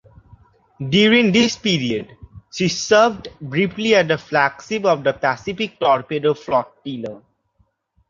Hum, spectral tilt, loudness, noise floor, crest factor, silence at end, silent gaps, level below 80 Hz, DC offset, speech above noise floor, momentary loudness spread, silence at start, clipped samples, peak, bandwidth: none; -4.5 dB/octave; -18 LUFS; -64 dBFS; 18 dB; 0.9 s; none; -54 dBFS; under 0.1%; 45 dB; 16 LU; 0.8 s; under 0.1%; -2 dBFS; 7.6 kHz